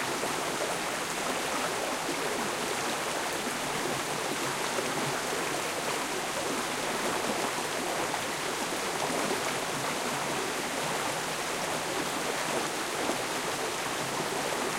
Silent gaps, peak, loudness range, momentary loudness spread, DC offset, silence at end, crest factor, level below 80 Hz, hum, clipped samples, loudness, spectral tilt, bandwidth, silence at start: none; -16 dBFS; 0 LU; 1 LU; under 0.1%; 0 s; 16 dB; -62 dBFS; none; under 0.1%; -31 LUFS; -2 dB/octave; 16 kHz; 0 s